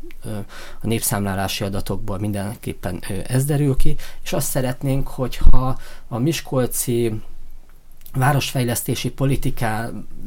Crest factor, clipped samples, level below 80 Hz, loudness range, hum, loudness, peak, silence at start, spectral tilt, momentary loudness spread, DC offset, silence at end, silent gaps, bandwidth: 18 dB; under 0.1%; -24 dBFS; 2 LU; none; -23 LUFS; 0 dBFS; 0 s; -5 dB/octave; 11 LU; under 0.1%; 0 s; none; 17 kHz